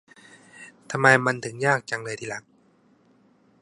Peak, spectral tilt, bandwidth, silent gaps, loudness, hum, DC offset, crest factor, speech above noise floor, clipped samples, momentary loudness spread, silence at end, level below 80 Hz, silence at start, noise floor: 0 dBFS; -4.5 dB/octave; 11.5 kHz; none; -23 LUFS; none; under 0.1%; 26 dB; 37 dB; under 0.1%; 27 LU; 1.2 s; -70 dBFS; 0.55 s; -61 dBFS